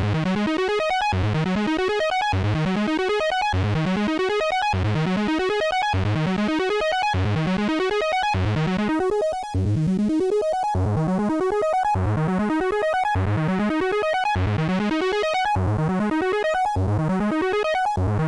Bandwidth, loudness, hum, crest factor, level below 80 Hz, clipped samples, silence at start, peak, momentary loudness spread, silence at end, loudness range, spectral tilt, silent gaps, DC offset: 11 kHz; -22 LUFS; none; 6 dB; -42 dBFS; under 0.1%; 0 s; -16 dBFS; 1 LU; 0 s; 0 LU; -6.5 dB/octave; none; under 0.1%